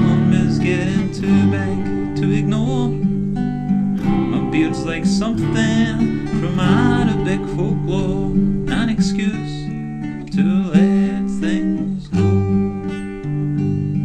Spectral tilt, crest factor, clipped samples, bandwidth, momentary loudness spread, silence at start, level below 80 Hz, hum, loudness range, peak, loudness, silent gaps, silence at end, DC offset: -7.5 dB/octave; 14 dB; under 0.1%; 9.2 kHz; 7 LU; 0 s; -34 dBFS; none; 2 LU; -2 dBFS; -18 LUFS; none; 0 s; under 0.1%